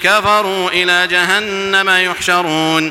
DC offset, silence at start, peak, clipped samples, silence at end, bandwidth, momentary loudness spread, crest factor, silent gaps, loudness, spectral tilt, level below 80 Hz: under 0.1%; 0 s; 0 dBFS; under 0.1%; 0 s; 17 kHz; 3 LU; 14 dB; none; -12 LUFS; -2.5 dB/octave; -50 dBFS